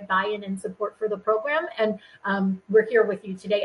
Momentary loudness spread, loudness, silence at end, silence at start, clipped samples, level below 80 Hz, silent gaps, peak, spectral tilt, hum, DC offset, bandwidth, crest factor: 10 LU; -25 LUFS; 0 s; 0 s; under 0.1%; -68 dBFS; none; -8 dBFS; -6.5 dB/octave; none; under 0.1%; 11.5 kHz; 16 dB